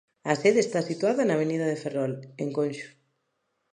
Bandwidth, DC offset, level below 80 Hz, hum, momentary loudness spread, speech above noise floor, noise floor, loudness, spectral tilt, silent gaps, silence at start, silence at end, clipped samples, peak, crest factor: 10.5 kHz; under 0.1%; -78 dBFS; none; 10 LU; 51 dB; -77 dBFS; -26 LUFS; -5.5 dB/octave; none; 0.25 s; 0.85 s; under 0.1%; -6 dBFS; 20 dB